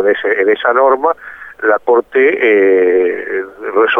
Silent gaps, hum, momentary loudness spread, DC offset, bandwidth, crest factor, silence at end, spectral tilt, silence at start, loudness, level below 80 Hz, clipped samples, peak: none; none; 10 LU; under 0.1%; 3.8 kHz; 12 dB; 0 s; -6 dB/octave; 0 s; -12 LUFS; -58 dBFS; under 0.1%; 0 dBFS